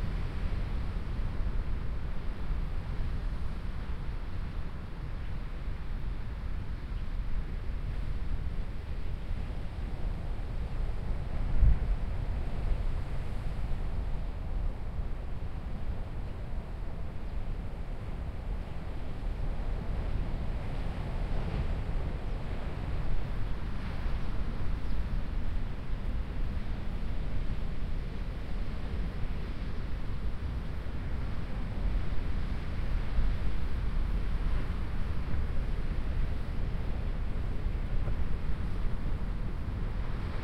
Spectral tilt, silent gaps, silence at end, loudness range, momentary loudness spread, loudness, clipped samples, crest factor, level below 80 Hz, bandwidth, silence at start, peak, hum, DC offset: -8 dB/octave; none; 0 s; 5 LU; 5 LU; -38 LUFS; under 0.1%; 20 dB; -34 dBFS; 5.8 kHz; 0 s; -12 dBFS; none; under 0.1%